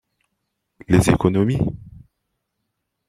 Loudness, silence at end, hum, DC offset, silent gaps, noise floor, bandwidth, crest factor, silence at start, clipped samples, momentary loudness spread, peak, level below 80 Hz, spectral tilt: -19 LUFS; 1.2 s; none; under 0.1%; none; -77 dBFS; 15.5 kHz; 20 dB; 0.9 s; under 0.1%; 10 LU; -2 dBFS; -40 dBFS; -7 dB/octave